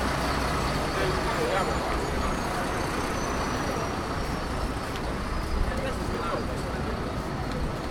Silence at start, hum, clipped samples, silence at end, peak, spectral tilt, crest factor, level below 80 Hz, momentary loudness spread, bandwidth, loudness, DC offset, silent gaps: 0 s; none; under 0.1%; 0 s; -12 dBFS; -5 dB/octave; 16 dB; -34 dBFS; 5 LU; 17.5 kHz; -29 LUFS; under 0.1%; none